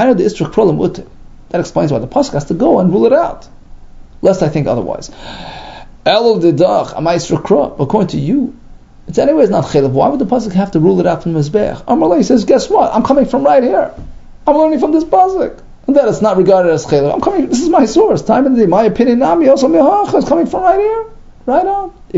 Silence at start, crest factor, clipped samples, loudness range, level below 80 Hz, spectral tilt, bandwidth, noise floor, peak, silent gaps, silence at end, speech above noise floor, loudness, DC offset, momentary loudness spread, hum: 0 s; 12 dB; 0.1%; 4 LU; -36 dBFS; -7 dB/octave; 8 kHz; -35 dBFS; 0 dBFS; none; 0 s; 24 dB; -12 LUFS; under 0.1%; 9 LU; none